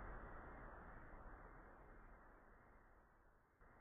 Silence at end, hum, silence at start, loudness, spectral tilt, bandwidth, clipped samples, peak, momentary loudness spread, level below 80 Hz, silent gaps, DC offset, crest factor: 0 s; none; 0 s; -61 LUFS; -2.5 dB/octave; 3.6 kHz; under 0.1%; -44 dBFS; 10 LU; -62 dBFS; none; under 0.1%; 16 dB